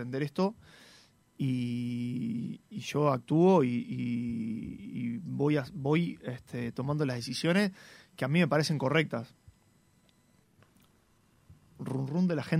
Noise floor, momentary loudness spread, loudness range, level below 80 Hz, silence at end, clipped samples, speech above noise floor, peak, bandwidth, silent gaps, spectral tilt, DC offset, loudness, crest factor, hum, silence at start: -66 dBFS; 13 LU; 6 LU; -66 dBFS; 0 s; under 0.1%; 36 dB; -12 dBFS; 15 kHz; none; -6.5 dB/octave; under 0.1%; -31 LUFS; 20 dB; none; 0 s